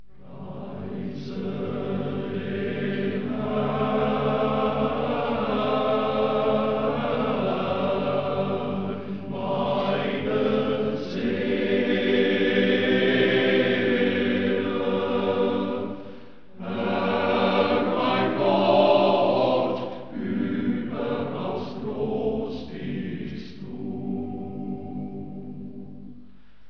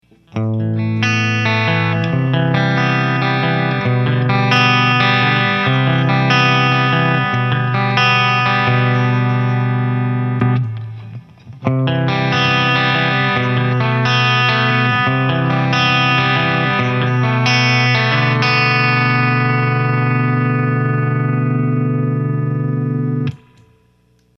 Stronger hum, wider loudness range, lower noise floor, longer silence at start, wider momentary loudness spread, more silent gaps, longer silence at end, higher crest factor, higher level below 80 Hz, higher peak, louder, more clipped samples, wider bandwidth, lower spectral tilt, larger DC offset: neither; first, 9 LU vs 4 LU; about the same, -52 dBFS vs -55 dBFS; about the same, 0.25 s vs 0.35 s; first, 13 LU vs 6 LU; neither; second, 0.45 s vs 1 s; about the same, 18 dB vs 14 dB; about the same, -54 dBFS vs -54 dBFS; second, -6 dBFS vs 0 dBFS; second, -25 LUFS vs -15 LUFS; neither; second, 5.4 kHz vs 6.4 kHz; first, -8 dB/octave vs -6 dB/octave; first, 0.8% vs under 0.1%